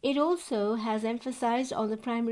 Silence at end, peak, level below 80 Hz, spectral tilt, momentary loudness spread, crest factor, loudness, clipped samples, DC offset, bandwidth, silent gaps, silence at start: 0 s; -14 dBFS; -70 dBFS; -5 dB/octave; 4 LU; 14 dB; -30 LUFS; under 0.1%; under 0.1%; 11.5 kHz; none; 0.05 s